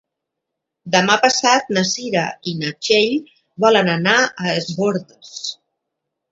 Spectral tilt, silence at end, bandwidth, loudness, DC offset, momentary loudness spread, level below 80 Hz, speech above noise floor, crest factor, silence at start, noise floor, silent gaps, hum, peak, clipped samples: -3.5 dB/octave; 0.8 s; 8 kHz; -17 LUFS; under 0.1%; 13 LU; -64 dBFS; 63 dB; 18 dB; 0.85 s; -80 dBFS; none; none; 0 dBFS; under 0.1%